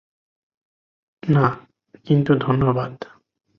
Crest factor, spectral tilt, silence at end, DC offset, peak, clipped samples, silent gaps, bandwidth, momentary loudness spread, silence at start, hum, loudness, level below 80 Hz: 18 dB; -10 dB/octave; 0.55 s; under 0.1%; -4 dBFS; under 0.1%; none; 5.6 kHz; 19 LU; 1.25 s; none; -20 LUFS; -52 dBFS